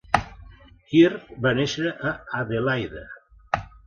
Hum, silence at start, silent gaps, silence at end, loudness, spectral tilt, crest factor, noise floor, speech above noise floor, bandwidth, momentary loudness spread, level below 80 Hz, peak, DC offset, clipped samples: none; 0.1 s; none; 0.2 s; -24 LUFS; -6 dB/octave; 24 dB; -48 dBFS; 25 dB; 9.4 kHz; 16 LU; -48 dBFS; -2 dBFS; under 0.1%; under 0.1%